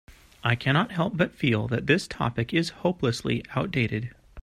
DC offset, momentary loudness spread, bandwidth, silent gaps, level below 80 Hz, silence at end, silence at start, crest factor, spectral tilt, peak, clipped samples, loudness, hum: under 0.1%; 5 LU; 13.5 kHz; none; -52 dBFS; 0 s; 0.1 s; 20 dB; -6 dB/octave; -6 dBFS; under 0.1%; -26 LUFS; none